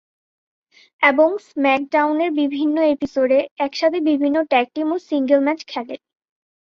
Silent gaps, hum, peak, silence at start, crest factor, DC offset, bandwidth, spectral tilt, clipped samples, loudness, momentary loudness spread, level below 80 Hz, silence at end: 3.51-3.56 s; none; -2 dBFS; 1 s; 16 dB; under 0.1%; 7 kHz; -4.5 dB/octave; under 0.1%; -19 LUFS; 7 LU; -64 dBFS; 0.7 s